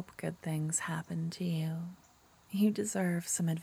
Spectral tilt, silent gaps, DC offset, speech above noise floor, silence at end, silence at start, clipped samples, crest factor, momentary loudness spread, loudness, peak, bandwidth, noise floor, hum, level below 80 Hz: -5 dB/octave; none; under 0.1%; 29 dB; 0 s; 0 s; under 0.1%; 16 dB; 10 LU; -34 LUFS; -18 dBFS; 16 kHz; -63 dBFS; none; -72 dBFS